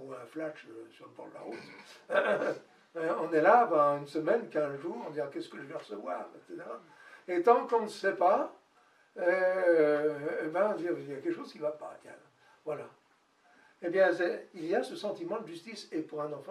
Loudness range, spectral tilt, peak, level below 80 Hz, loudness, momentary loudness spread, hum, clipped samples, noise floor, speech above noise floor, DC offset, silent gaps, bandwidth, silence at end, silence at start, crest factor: 7 LU; -5.5 dB/octave; -10 dBFS; under -90 dBFS; -31 LUFS; 20 LU; none; under 0.1%; -68 dBFS; 37 dB; under 0.1%; none; 12 kHz; 0 s; 0 s; 22 dB